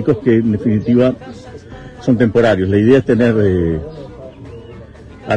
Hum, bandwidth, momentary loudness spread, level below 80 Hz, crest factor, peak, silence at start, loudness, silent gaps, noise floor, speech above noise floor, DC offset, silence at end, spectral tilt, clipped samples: none; 8.8 kHz; 23 LU; -38 dBFS; 14 dB; 0 dBFS; 0 s; -14 LUFS; none; -35 dBFS; 23 dB; under 0.1%; 0 s; -8.5 dB/octave; under 0.1%